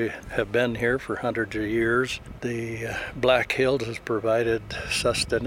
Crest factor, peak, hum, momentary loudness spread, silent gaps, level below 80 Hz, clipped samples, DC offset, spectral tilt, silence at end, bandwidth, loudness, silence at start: 20 dB; -6 dBFS; none; 8 LU; none; -46 dBFS; under 0.1%; under 0.1%; -4.5 dB/octave; 0 s; 16 kHz; -25 LUFS; 0 s